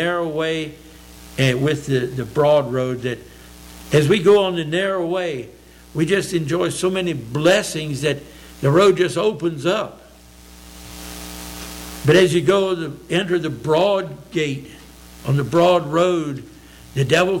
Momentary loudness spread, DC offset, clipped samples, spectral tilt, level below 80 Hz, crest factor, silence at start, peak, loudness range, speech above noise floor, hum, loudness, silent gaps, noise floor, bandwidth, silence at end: 17 LU; under 0.1%; under 0.1%; -5.5 dB/octave; -46 dBFS; 14 dB; 0 s; -6 dBFS; 2 LU; 26 dB; none; -19 LUFS; none; -44 dBFS; 17 kHz; 0 s